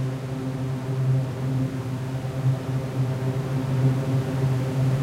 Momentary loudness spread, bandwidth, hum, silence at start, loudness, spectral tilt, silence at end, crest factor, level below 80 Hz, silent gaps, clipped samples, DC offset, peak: 6 LU; 12.5 kHz; none; 0 s; -26 LUFS; -8 dB/octave; 0 s; 14 dB; -50 dBFS; none; under 0.1%; under 0.1%; -10 dBFS